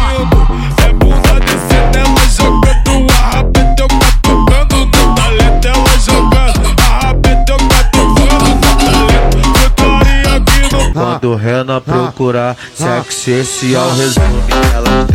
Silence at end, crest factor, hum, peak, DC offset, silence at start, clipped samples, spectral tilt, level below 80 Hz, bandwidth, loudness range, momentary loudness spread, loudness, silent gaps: 0 s; 8 dB; none; 0 dBFS; under 0.1%; 0 s; under 0.1%; -4.5 dB/octave; -10 dBFS; 16.5 kHz; 4 LU; 5 LU; -10 LUFS; none